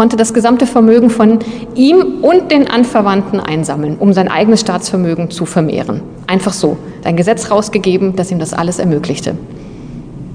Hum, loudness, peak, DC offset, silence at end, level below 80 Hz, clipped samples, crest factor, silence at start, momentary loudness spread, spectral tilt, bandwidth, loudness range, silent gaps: none; -12 LUFS; 0 dBFS; under 0.1%; 0 s; -42 dBFS; 0.5%; 12 dB; 0 s; 12 LU; -6 dB/octave; 10 kHz; 5 LU; none